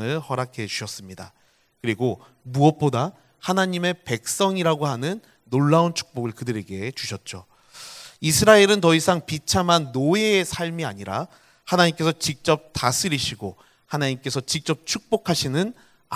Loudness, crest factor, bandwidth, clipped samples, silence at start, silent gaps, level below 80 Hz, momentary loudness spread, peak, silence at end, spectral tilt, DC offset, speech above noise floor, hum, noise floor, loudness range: -22 LUFS; 22 dB; 16 kHz; under 0.1%; 0 s; none; -52 dBFS; 16 LU; 0 dBFS; 0 s; -4.5 dB/octave; under 0.1%; 21 dB; none; -43 dBFS; 6 LU